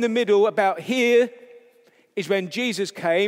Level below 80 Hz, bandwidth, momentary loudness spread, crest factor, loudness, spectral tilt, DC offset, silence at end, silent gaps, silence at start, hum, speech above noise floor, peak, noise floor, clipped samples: -84 dBFS; 15.5 kHz; 8 LU; 14 dB; -21 LUFS; -4.5 dB/octave; under 0.1%; 0 s; none; 0 s; none; 37 dB; -6 dBFS; -57 dBFS; under 0.1%